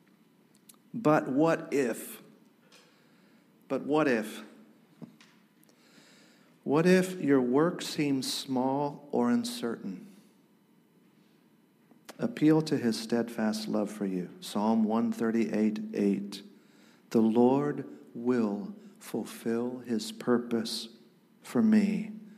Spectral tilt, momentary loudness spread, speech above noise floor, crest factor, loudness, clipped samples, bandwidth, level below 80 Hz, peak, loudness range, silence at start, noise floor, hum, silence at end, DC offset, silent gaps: -6 dB/octave; 15 LU; 36 dB; 18 dB; -29 LUFS; under 0.1%; 15.5 kHz; -84 dBFS; -12 dBFS; 7 LU; 0.95 s; -64 dBFS; none; 0.05 s; under 0.1%; none